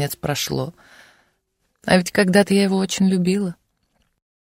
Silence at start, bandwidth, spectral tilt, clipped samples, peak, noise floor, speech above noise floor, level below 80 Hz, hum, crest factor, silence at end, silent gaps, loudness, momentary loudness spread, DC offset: 0 s; 16 kHz; -5 dB/octave; under 0.1%; -2 dBFS; -70 dBFS; 51 dB; -54 dBFS; none; 20 dB; 0.85 s; none; -19 LUFS; 12 LU; under 0.1%